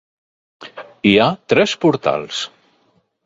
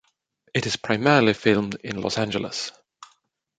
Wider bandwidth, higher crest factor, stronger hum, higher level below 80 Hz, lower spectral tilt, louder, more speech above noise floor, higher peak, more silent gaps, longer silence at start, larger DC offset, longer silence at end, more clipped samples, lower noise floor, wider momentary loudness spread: second, 7.8 kHz vs 9.4 kHz; about the same, 18 dB vs 22 dB; neither; about the same, -56 dBFS vs -58 dBFS; about the same, -5 dB/octave vs -5 dB/octave; first, -16 LUFS vs -23 LUFS; about the same, 45 dB vs 44 dB; about the same, 0 dBFS vs -2 dBFS; neither; about the same, 0.6 s vs 0.55 s; neither; first, 0.8 s vs 0.55 s; neither; second, -61 dBFS vs -66 dBFS; first, 22 LU vs 12 LU